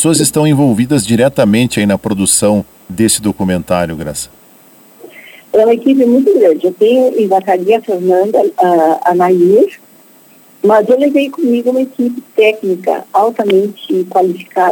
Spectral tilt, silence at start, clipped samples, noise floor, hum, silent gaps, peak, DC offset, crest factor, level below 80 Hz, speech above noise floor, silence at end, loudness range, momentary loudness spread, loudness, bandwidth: -5 dB/octave; 0 s; under 0.1%; -43 dBFS; none; none; 0 dBFS; under 0.1%; 12 dB; -48 dBFS; 32 dB; 0 s; 4 LU; 7 LU; -11 LUFS; 19.5 kHz